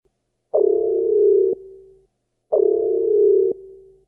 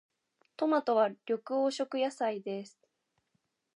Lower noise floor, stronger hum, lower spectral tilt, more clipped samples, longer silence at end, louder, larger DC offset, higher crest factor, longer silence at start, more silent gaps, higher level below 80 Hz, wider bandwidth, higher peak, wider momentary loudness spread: second, -69 dBFS vs -80 dBFS; neither; first, -12.5 dB/octave vs -4.5 dB/octave; neither; second, 0.35 s vs 1.1 s; first, -18 LUFS vs -32 LUFS; neither; about the same, 14 dB vs 18 dB; about the same, 0.55 s vs 0.6 s; neither; first, -60 dBFS vs under -90 dBFS; second, 1.3 kHz vs 11 kHz; first, -6 dBFS vs -16 dBFS; second, 8 LU vs 12 LU